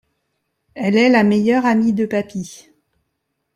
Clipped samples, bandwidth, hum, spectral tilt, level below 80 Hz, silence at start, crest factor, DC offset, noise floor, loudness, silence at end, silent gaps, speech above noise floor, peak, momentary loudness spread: under 0.1%; 11 kHz; none; -6 dB/octave; -60 dBFS; 0.75 s; 16 dB; under 0.1%; -73 dBFS; -16 LUFS; 1 s; none; 58 dB; -2 dBFS; 15 LU